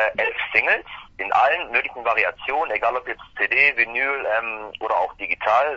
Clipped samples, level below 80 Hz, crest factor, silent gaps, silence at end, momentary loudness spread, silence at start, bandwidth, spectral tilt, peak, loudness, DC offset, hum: under 0.1%; -56 dBFS; 22 dB; none; 0 s; 11 LU; 0 s; 7.6 kHz; -3.5 dB/octave; 0 dBFS; -21 LUFS; under 0.1%; none